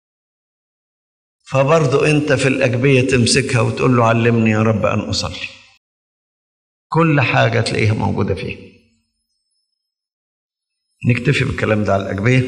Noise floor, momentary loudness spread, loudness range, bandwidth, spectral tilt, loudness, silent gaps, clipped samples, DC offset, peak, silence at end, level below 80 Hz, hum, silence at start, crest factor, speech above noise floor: -76 dBFS; 8 LU; 9 LU; 11 kHz; -5.5 dB/octave; -15 LUFS; 5.77-6.90 s, 10.13-10.49 s; under 0.1%; under 0.1%; 0 dBFS; 0 s; -48 dBFS; none; 1.5 s; 16 dB; 62 dB